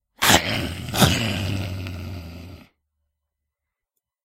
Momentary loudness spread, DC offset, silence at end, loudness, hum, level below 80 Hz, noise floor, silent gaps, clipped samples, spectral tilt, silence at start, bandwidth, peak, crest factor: 20 LU; under 0.1%; 1.65 s; -21 LUFS; none; -42 dBFS; -84 dBFS; none; under 0.1%; -3.5 dB/octave; 0.2 s; 16 kHz; 0 dBFS; 26 dB